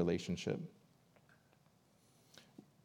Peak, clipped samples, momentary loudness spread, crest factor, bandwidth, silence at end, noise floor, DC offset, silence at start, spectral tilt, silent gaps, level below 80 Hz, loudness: -22 dBFS; under 0.1%; 24 LU; 24 dB; 13 kHz; 0.25 s; -71 dBFS; under 0.1%; 0 s; -6 dB/octave; none; -76 dBFS; -41 LUFS